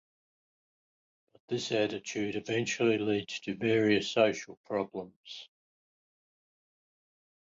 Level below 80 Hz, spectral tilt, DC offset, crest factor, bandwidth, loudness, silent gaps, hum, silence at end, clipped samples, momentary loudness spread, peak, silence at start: -72 dBFS; -4.5 dB/octave; under 0.1%; 22 dB; 7.8 kHz; -31 LUFS; 4.57-4.64 s, 5.16-5.23 s; none; 2.05 s; under 0.1%; 16 LU; -12 dBFS; 1.5 s